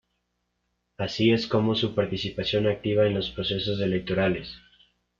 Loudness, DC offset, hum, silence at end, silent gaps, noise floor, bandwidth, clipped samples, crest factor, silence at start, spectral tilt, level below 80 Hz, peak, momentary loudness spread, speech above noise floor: -26 LUFS; under 0.1%; 60 Hz at -45 dBFS; 0.6 s; none; -77 dBFS; 7.4 kHz; under 0.1%; 18 dB; 1 s; -6.5 dB/octave; -54 dBFS; -8 dBFS; 7 LU; 52 dB